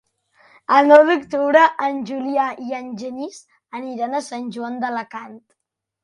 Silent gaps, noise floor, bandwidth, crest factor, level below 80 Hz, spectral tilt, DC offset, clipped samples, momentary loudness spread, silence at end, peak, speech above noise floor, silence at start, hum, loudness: none; -56 dBFS; 11 kHz; 20 dB; -70 dBFS; -4.5 dB/octave; under 0.1%; under 0.1%; 21 LU; 0.65 s; 0 dBFS; 38 dB; 0.7 s; none; -18 LUFS